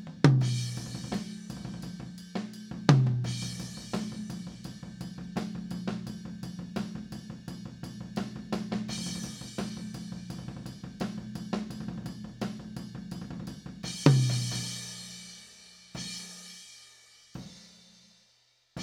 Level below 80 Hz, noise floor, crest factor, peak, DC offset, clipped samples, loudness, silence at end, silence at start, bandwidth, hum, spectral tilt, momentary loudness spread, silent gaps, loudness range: -58 dBFS; -67 dBFS; 30 dB; -2 dBFS; under 0.1%; under 0.1%; -33 LUFS; 0 s; 0 s; 13 kHz; 60 Hz at -55 dBFS; -5.5 dB/octave; 20 LU; none; 8 LU